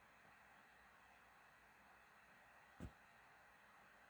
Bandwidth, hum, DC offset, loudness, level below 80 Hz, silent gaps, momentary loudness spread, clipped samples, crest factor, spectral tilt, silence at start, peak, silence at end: over 20 kHz; none; under 0.1%; -66 LUFS; -74 dBFS; none; 8 LU; under 0.1%; 26 dB; -5 dB/octave; 0 s; -40 dBFS; 0 s